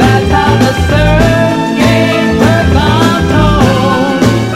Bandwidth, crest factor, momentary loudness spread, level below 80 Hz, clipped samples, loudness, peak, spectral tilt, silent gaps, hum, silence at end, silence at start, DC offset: 15.5 kHz; 8 dB; 2 LU; -20 dBFS; 0.8%; -9 LUFS; 0 dBFS; -6 dB/octave; none; none; 0 s; 0 s; under 0.1%